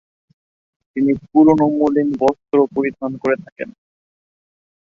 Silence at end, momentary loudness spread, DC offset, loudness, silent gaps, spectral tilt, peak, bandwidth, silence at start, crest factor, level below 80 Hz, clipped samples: 1.2 s; 17 LU; under 0.1%; -17 LUFS; 3.52-3.56 s; -8.5 dB/octave; -2 dBFS; 7 kHz; 0.95 s; 16 dB; -56 dBFS; under 0.1%